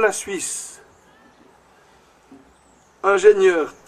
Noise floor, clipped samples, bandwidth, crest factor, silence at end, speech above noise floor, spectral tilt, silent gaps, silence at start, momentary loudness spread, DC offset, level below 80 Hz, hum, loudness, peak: -54 dBFS; under 0.1%; 13.5 kHz; 20 dB; 0.15 s; 37 dB; -2.5 dB/octave; none; 0 s; 15 LU; under 0.1%; -62 dBFS; none; -18 LUFS; -2 dBFS